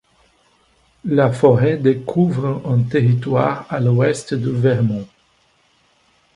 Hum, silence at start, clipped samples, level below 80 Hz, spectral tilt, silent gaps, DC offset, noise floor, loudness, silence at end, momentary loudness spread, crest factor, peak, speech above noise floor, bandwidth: none; 1.05 s; under 0.1%; -54 dBFS; -8 dB/octave; none; under 0.1%; -59 dBFS; -17 LUFS; 1.3 s; 8 LU; 18 dB; 0 dBFS; 43 dB; 11 kHz